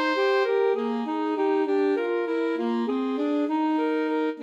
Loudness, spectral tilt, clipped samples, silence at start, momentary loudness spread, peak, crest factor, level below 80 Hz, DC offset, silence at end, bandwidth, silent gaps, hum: -25 LUFS; -5.5 dB/octave; under 0.1%; 0 s; 4 LU; -14 dBFS; 12 dB; -88 dBFS; under 0.1%; 0 s; 7.8 kHz; none; none